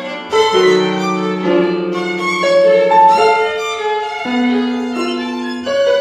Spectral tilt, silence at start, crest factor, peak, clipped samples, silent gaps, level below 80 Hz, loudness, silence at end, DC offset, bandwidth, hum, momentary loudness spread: -5 dB/octave; 0 s; 14 dB; 0 dBFS; under 0.1%; none; -58 dBFS; -14 LUFS; 0 s; under 0.1%; 13 kHz; none; 9 LU